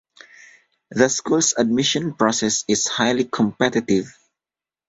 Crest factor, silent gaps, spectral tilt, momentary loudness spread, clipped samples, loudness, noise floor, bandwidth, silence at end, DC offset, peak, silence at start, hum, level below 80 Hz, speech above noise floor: 20 dB; none; -3 dB/octave; 4 LU; under 0.1%; -19 LUFS; under -90 dBFS; 8.2 kHz; 0.75 s; under 0.1%; -2 dBFS; 0.9 s; none; -58 dBFS; over 70 dB